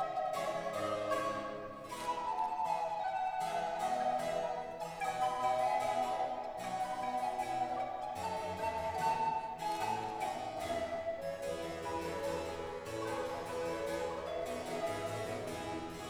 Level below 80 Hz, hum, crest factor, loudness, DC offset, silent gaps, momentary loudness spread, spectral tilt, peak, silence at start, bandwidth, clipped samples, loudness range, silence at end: -66 dBFS; none; 16 dB; -38 LUFS; under 0.1%; none; 6 LU; -4 dB/octave; -22 dBFS; 0 s; over 20 kHz; under 0.1%; 4 LU; 0 s